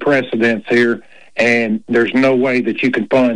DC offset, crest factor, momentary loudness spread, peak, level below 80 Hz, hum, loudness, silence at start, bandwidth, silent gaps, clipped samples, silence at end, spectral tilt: 0.7%; 10 dB; 4 LU; -4 dBFS; -56 dBFS; none; -15 LUFS; 0 s; 10 kHz; none; under 0.1%; 0 s; -6 dB/octave